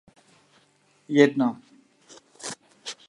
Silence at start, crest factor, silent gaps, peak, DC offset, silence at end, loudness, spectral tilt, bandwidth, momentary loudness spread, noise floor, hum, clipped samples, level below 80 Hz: 1.1 s; 24 dB; none; -2 dBFS; under 0.1%; 0.15 s; -23 LUFS; -5 dB/octave; 11.5 kHz; 19 LU; -63 dBFS; none; under 0.1%; -80 dBFS